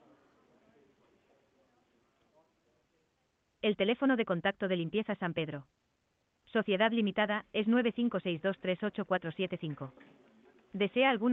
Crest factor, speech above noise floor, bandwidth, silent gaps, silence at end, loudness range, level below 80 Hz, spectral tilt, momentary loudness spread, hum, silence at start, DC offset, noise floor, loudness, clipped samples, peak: 18 dB; 46 dB; 4.1 kHz; none; 0 s; 4 LU; -74 dBFS; -8.5 dB/octave; 10 LU; none; 3.65 s; under 0.1%; -78 dBFS; -32 LUFS; under 0.1%; -16 dBFS